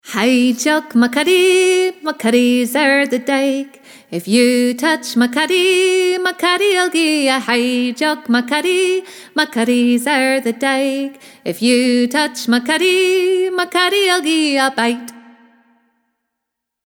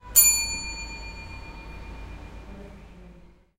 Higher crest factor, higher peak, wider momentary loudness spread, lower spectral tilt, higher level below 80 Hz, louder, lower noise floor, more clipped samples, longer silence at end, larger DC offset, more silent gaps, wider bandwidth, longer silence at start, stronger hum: second, 14 dB vs 24 dB; about the same, -2 dBFS vs -4 dBFS; second, 7 LU vs 27 LU; first, -3 dB/octave vs 0 dB/octave; second, -68 dBFS vs -42 dBFS; first, -15 LUFS vs -20 LUFS; first, -79 dBFS vs -51 dBFS; neither; first, 1.65 s vs 0.3 s; neither; neither; first, 18.5 kHz vs 16.5 kHz; about the same, 0.05 s vs 0.05 s; neither